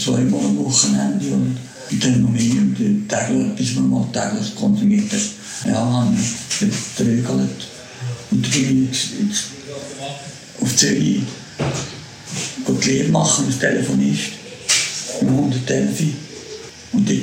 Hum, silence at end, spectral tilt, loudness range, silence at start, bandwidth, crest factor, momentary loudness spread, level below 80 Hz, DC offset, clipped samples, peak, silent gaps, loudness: none; 0 s; -4 dB/octave; 3 LU; 0 s; 16.5 kHz; 18 dB; 13 LU; -50 dBFS; under 0.1%; under 0.1%; 0 dBFS; none; -18 LUFS